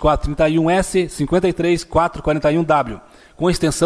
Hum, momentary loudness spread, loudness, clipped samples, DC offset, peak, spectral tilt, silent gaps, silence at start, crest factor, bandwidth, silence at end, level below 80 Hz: none; 4 LU; -18 LUFS; under 0.1%; under 0.1%; -4 dBFS; -5.5 dB/octave; none; 0 s; 14 dB; 11 kHz; 0 s; -32 dBFS